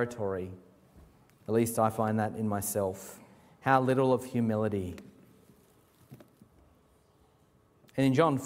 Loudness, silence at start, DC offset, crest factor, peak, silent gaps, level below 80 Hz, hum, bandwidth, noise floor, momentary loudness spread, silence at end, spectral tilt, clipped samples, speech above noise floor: -30 LUFS; 0 s; under 0.1%; 22 dB; -10 dBFS; none; -66 dBFS; none; 16 kHz; -65 dBFS; 19 LU; 0 s; -6 dB/octave; under 0.1%; 36 dB